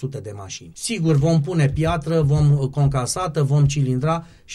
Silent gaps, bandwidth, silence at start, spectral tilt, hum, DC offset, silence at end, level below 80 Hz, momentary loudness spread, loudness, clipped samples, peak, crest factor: none; 12.5 kHz; 0 s; -6.5 dB/octave; none; under 0.1%; 0 s; -38 dBFS; 13 LU; -20 LUFS; under 0.1%; -8 dBFS; 10 dB